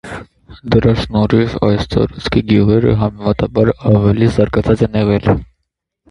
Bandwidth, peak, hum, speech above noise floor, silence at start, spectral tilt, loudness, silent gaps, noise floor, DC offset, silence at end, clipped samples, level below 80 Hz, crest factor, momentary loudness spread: 10.5 kHz; 0 dBFS; none; 60 dB; 0.05 s; -8.5 dB/octave; -14 LUFS; none; -73 dBFS; under 0.1%; 0.65 s; under 0.1%; -30 dBFS; 14 dB; 5 LU